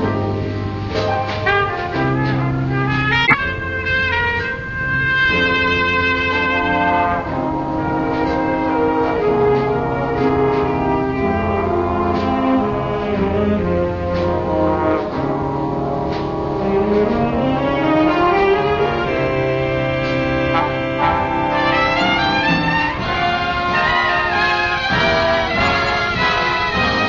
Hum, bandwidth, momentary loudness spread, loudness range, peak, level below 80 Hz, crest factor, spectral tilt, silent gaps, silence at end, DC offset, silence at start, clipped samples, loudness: none; 7.4 kHz; 6 LU; 3 LU; 0 dBFS; -36 dBFS; 18 dB; -6.5 dB/octave; none; 0 s; under 0.1%; 0 s; under 0.1%; -17 LUFS